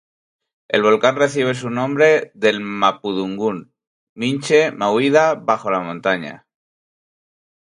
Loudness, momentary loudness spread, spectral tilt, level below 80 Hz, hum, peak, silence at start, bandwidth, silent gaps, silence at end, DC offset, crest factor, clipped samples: -18 LUFS; 9 LU; -5 dB/octave; -66 dBFS; none; 0 dBFS; 0.7 s; 11 kHz; 3.87-4.16 s; 1.35 s; under 0.1%; 18 dB; under 0.1%